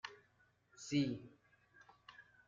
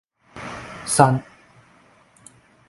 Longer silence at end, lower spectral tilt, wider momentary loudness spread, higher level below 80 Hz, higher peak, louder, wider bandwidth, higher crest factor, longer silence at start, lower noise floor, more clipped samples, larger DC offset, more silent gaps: second, 0.25 s vs 1.45 s; about the same, -5.5 dB/octave vs -5 dB/octave; first, 23 LU vs 19 LU; second, -78 dBFS vs -56 dBFS; second, -26 dBFS vs 0 dBFS; second, -41 LUFS vs -19 LUFS; second, 7.6 kHz vs 12 kHz; about the same, 20 dB vs 24 dB; second, 0.05 s vs 0.35 s; first, -75 dBFS vs -55 dBFS; neither; neither; neither